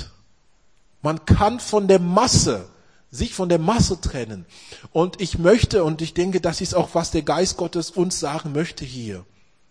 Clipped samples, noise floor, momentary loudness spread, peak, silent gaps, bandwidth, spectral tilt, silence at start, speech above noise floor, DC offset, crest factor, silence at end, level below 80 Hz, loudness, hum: under 0.1%; -61 dBFS; 16 LU; -2 dBFS; none; 10.5 kHz; -5 dB/octave; 0 s; 40 dB; 0.2%; 18 dB; 0.45 s; -36 dBFS; -20 LUFS; none